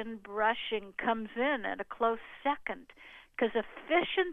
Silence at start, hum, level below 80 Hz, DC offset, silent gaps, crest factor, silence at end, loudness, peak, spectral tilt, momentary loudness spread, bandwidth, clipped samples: 0 s; none; -64 dBFS; under 0.1%; none; 18 dB; 0 s; -33 LUFS; -14 dBFS; -6 dB/octave; 11 LU; 4.5 kHz; under 0.1%